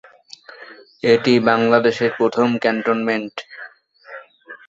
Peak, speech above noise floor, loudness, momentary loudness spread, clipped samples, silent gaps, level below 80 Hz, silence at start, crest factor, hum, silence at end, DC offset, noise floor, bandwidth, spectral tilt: -2 dBFS; 26 dB; -17 LUFS; 24 LU; under 0.1%; none; -62 dBFS; 0.5 s; 18 dB; none; 0.1 s; under 0.1%; -43 dBFS; 7.8 kHz; -6 dB/octave